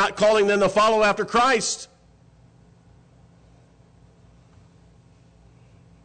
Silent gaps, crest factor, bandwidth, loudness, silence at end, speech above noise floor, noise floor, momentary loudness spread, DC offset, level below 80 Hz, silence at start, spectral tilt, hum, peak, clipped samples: none; 14 dB; 9.4 kHz; -20 LUFS; 4.2 s; 35 dB; -54 dBFS; 10 LU; under 0.1%; -54 dBFS; 0 s; -3 dB/octave; none; -12 dBFS; under 0.1%